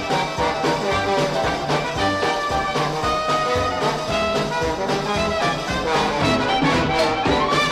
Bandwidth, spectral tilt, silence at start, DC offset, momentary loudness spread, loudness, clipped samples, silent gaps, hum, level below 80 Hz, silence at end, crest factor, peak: 15.5 kHz; -4.5 dB/octave; 0 s; under 0.1%; 4 LU; -20 LUFS; under 0.1%; none; none; -40 dBFS; 0 s; 14 dB; -6 dBFS